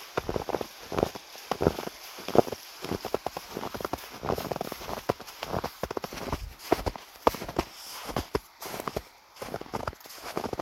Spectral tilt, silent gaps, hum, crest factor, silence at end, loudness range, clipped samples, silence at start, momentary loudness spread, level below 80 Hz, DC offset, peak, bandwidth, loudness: -5 dB/octave; none; none; 32 dB; 0 s; 4 LU; under 0.1%; 0 s; 10 LU; -48 dBFS; under 0.1%; -2 dBFS; 16.5 kHz; -33 LUFS